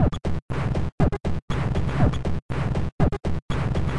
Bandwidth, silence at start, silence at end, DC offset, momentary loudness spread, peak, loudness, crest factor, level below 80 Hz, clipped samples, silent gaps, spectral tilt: 11 kHz; 0 s; 0 s; 2%; 6 LU; -6 dBFS; -26 LUFS; 16 dB; -30 dBFS; under 0.1%; 0.42-0.48 s, 0.92-0.98 s, 1.42-1.48 s, 2.42-2.49 s, 2.92-2.98 s, 3.42-3.49 s; -8 dB/octave